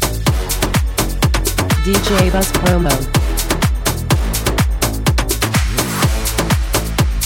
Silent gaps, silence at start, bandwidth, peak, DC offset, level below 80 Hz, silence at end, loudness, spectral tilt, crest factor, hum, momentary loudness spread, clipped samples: none; 0 s; 17 kHz; 0 dBFS; under 0.1%; -20 dBFS; 0 s; -16 LUFS; -4.5 dB/octave; 14 dB; none; 4 LU; under 0.1%